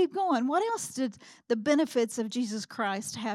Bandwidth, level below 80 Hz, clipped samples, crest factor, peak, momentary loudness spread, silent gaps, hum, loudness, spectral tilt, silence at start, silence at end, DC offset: 15.5 kHz; -78 dBFS; under 0.1%; 16 dB; -14 dBFS; 7 LU; none; none; -30 LUFS; -4 dB/octave; 0 s; 0 s; under 0.1%